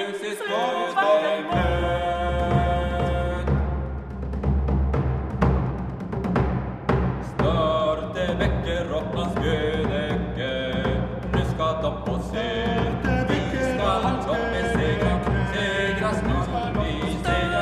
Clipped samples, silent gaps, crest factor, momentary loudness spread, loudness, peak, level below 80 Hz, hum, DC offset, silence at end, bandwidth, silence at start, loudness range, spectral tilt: under 0.1%; none; 16 dB; 5 LU; -24 LUFS; -8 dBFS; -30 dBFS; none; under 0.1%; 0 s; 12 kHz; 0 s; 2 LU; -6.5 dB/octave